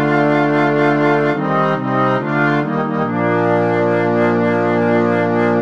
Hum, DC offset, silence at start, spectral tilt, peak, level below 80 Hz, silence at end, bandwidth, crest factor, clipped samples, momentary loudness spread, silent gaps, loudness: none; 0.6%; 0 s; -8.5 dB/octave; -2 dBFS; -66 dBFS; 0 s; 7.6 kHz; 12 dB; under 0.1%; 3 LU; none; -15 LUFS